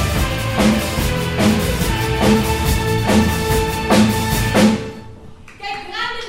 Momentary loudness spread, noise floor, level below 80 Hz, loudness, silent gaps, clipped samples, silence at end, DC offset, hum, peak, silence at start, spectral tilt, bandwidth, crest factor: 10 LU; -37 dBFS; -28 dBFS; -17 LUFS; none; under 0.1%; 0 s; under 0.1%; none; 0 dBFS; 0 s; -5 dB/octave; 16.5 kHz; 16 dB